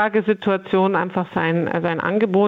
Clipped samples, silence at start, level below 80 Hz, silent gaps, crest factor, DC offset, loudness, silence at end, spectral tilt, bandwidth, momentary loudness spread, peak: under 0.1%; 0 s; -62 dBFS; none; 14 dB; under 0.1%; -20 LUFS; 0 s; -9 dB/octave; 5 kHz; 3 LU; -6 dBFS